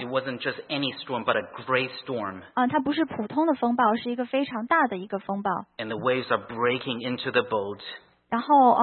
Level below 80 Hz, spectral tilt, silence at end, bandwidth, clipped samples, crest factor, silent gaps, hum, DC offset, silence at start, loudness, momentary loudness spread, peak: -70 dBFS; -9.5 dB/octave; 0 s; 4.4 kHz; under 0.1%; 18 dB; none; none; under 0.1%; 0 s; -26 LUFS; 9 LU; -8 dBFS